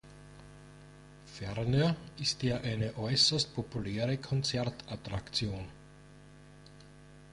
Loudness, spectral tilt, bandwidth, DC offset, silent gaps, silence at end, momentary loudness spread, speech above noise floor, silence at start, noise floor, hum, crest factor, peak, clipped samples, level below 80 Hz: -32 LUFS; -4.5 dB/octave; 11.5 kHz; under 0.1%; none; 0 s; 27 LU; 22 dB; 0.05 s; -55 dBFS; 50 Hz at -55 dBFS; 22 dB; -14 dBFS; under 0.1%; -56 dBFS